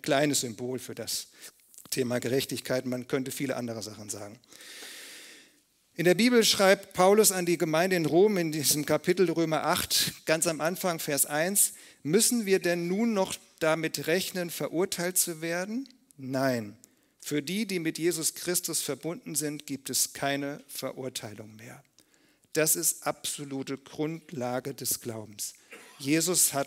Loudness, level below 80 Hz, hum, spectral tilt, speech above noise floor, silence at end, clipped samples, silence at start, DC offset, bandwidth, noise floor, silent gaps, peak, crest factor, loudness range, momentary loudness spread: -28 LUFS; -70 dBFS; none; -3 dB/octave; 37 dB; 0 s; under 0.1%; 0.05 s; under 0.1%; 16 kHz; -65 dBFS; none; -6 dBFS; 22 dB; 9 LU; 15 LU